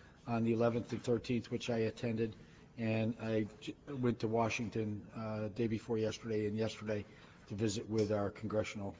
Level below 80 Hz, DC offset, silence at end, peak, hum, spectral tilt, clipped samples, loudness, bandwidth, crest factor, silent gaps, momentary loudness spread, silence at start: -64 dBFS; under 0.1%; 0 s; -20 dBFS; none; -6.5 dB/octave; under 0.1%; -38 LUFS; 8 kHz; 18 dB; none; 8 LU; 0 s